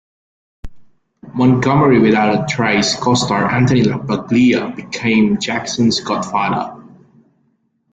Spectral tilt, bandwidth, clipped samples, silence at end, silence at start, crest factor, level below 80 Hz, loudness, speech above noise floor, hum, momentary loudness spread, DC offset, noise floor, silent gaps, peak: -5.5 dB/octave; 9.2 kHz; under 0.1%; 1.1 s; 0.65 s; 14 dB; -46 dBFS; -15 LUFS; 48 dB; none; 8 LU; under 0.1%; -62 dBFS; none; -2 dBFS